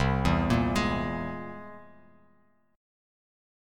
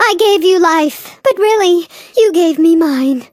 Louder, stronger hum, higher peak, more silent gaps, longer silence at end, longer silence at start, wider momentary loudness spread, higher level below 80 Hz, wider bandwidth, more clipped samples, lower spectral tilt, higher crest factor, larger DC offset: second, -28 LUFS vs -11 LUFS; neither; second, -10 dBFS vs 0 dBFS; neither; first, 1.9 s vs 0.1 s; about the same, 0 s vs 0 s; first, 18 LU vs 6 LU; first, -40 dBFS vs -62 dBFS; about the same, 17 kHz vs 16 kHz; neither; first, -6.5 dB/octave vs -2.5 dB/octave; first, 20 dB vs 10 dB; neither